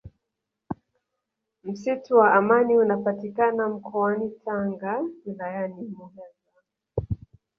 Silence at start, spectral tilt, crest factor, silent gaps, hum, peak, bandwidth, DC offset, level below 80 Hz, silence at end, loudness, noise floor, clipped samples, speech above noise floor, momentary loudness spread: 0.05 s; -8.5 dB/octave; 22 dB; none; none; -4 dBFS; 6.6 kHz; under 0.1%; -52 dBFS; 0.45 s; -24 LUFS; -83 dBFS; under 0.1%; 60 dB; 20 LU